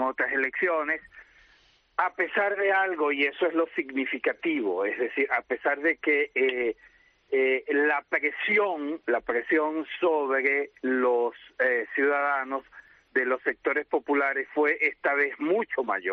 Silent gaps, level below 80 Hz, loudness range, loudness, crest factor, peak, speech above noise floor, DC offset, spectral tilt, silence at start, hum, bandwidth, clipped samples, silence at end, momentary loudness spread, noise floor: none; -70 dBFS; 1 LU; -26 LUFS; 16 dB; -10 dBFS; 35 dB; under 0.1%; -1 dB/octave; 0 s; none; 6 kHz; under 0.1%; 0 s; 5 LU; -62 dBFS